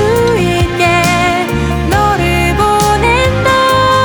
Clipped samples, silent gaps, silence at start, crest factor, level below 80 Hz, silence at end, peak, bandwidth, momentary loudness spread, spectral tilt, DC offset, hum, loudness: under 0.1%; none; 0 s; 10 dB; -22 dBFS; 0 s; 0 dBFS; over 20 kHz; 4 LU; -5 dB/octave; under 0.1%; none; -11 LUFS